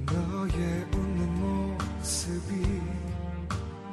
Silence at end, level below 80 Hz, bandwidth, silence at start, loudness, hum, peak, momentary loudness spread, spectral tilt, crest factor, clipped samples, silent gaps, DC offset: 0 s; -36 dBFS; 15 kHz; 0 s; -31 LUFS; none; -16 dBFS; 5 LU; -5.5 dB/octave; 14 dB; under 0.1%; none; under 0.1%